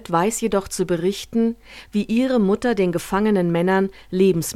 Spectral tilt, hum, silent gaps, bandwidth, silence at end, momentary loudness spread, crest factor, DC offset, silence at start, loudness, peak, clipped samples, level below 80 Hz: -5.5 dB/octave; none; none; 16 kHz; 0 s; 5 LU; 14 dB; under 0.1%; 0.1 s; -21 LUFS; -6 dBFS; under 0.1%; -48 dBFS